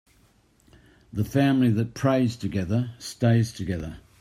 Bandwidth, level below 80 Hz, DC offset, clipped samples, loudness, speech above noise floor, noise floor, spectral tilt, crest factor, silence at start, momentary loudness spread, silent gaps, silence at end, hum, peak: 15 kHz; -52 dBFS; under 0.1%; under 0.1%; -25 LUFS; 37 dB; -61 dBFS; -7 dB/octave; 16 dB; 1.15 s; 12 LU; none; 0.2 s; none; -8 dBFS